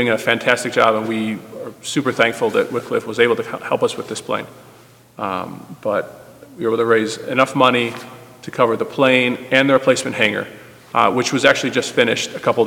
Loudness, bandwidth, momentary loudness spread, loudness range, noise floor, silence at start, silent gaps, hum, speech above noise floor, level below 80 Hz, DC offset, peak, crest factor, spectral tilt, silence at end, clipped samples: -18 LUFS; 18 kHz; 13 LU; 6 LU; -46 dBFS; 0 s; none; none; 29 dB; -62 dBFS; under 0.1%; 0 dBFS; 18 dB; -4 dB/octave; 0 s; under 0.1%